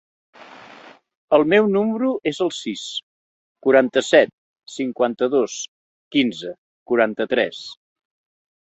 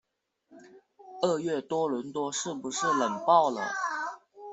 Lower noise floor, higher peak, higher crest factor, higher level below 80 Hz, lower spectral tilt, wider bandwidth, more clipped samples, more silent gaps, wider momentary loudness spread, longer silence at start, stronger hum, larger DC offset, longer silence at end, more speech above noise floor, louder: second, -46 dBFS vs -73 dBFS; first, -2 dBFS vs -10 dBFS; about the same, 20 dB vs 20 dB; first, -66 dBFS vs -76 dBFS; about the same, -4.5 dB/octave vs -3.5 dB/octave; about the same, 8.2 kHz vs 8.2 kHz; neither; first, 1.17-1.28 s, 3.03-3.56 s, 4.33-4.54 s, 5.68-6.11 s, 6.58-6.86 s vs none; first, 15 LU vs 11 LU; about the same, 0.4 s vs 0.5 s; neither; neither; first, 1 s vs 0 s; second, 27 dB vs 45 dB; first, -20 LUFS vs -29 LUFS